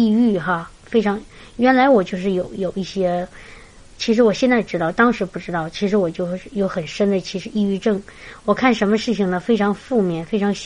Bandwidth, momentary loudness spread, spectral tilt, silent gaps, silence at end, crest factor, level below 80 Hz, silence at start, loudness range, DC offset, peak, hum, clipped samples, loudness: 10.5 kHz; 10 LU; -6 dB/octave; none; 0 s; 18 dB; -48 dBFS; 0 s; 2 LU; under 0.1%; -2 dBFS; none; under 0.1%; -19 LUFS